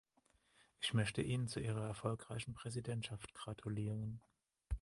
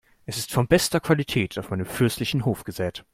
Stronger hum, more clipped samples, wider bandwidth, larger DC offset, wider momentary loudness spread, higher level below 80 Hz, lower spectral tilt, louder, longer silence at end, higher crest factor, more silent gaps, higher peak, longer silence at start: neither; neither; second, 11.5 kHz vs 16.5 kHz; neither; about the same, 11 LU vs 10 LU; second, -56 dBFS vs -48 dBFS; about the same, -5.5 dB/octave vs -5 dB/octave; second, -43 LUFS vs -24 LUFS; about the same, 0.05 s vs 0.1 s; about the same, 20 dB vs 20 dB; neither; second, -24 dBFS vs -4 dBFS; first, 0.8 s vs 0.3 s